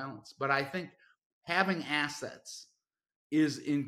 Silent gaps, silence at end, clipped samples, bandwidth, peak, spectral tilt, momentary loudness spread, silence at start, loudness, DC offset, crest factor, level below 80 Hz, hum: 1.26-1.42 s, 3.16-3.30 s; 0 s; under 0.1%; 13.5 kHz; -10 dBFS; -4.5 dB/octave; 17 LU; 0 s; -32 LUFS; under 0.1%; 24 dB; -78 dBFS; none